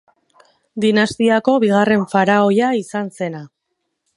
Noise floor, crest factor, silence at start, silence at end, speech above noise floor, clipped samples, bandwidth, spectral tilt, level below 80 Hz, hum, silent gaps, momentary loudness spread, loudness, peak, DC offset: -74 dBFS; 16 dB; 0.75 s; 0.7 s; 58 dB; under 0.1%; 11.5 kHz; -6 dB/octave; -60 dBFS; none; none; 12 LU; -16 LUFS; 0 dBFS; under 0.1%